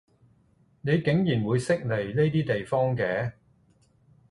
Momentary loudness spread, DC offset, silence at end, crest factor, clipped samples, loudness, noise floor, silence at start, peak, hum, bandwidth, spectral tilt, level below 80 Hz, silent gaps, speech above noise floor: 5 LU; under 0.1%; 1 s; 18 dB; under 0.1%; -26 LUFS; -63 dBFS; 0.85 s; -10 dBFS; none; 11.5 kHz; -7.5 dB/octave; -58 dBFS; none; 38 dB